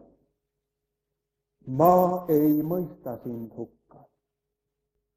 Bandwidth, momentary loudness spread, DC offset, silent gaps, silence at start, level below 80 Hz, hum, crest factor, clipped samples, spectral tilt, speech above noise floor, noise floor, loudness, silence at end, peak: 15.5 kHz; 20 LU; under 0.1%; none; 1.65 s; -64 dBFS; none; 22 dB; under 0.1%; -9.5 dB/octave; 60 dB; -84 dBFS; -23 LUFS; 1.5 s; -6 dBFS